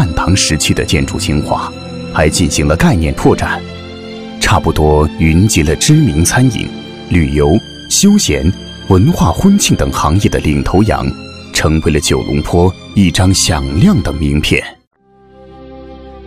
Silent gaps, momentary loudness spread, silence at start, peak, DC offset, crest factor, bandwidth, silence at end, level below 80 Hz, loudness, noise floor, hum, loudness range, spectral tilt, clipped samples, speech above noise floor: 14.87-14.91 s; 11 LU; 0 s; 0 dBFS; under 0.1%; 12 dB; 16 kHz; 0 s; -24 dBFS; -11 LUFS; -42 dBFS; none; 2 LU; -5 dB/octave; under 0.1%; 32 dB